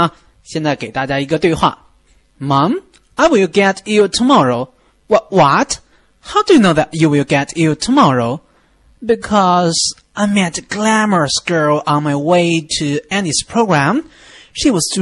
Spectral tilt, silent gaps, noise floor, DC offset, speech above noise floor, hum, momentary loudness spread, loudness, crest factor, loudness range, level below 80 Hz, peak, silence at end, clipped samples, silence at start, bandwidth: -4.5 dB/octave; none; -52 dBFS; under 0.1%; 39 dB; none; 9 LU; -14 LUFS; 14 dB; 2 LU; -46 dBFS; 0 dBFS; 0 s; under 0.1%; 0 s; 12 kHz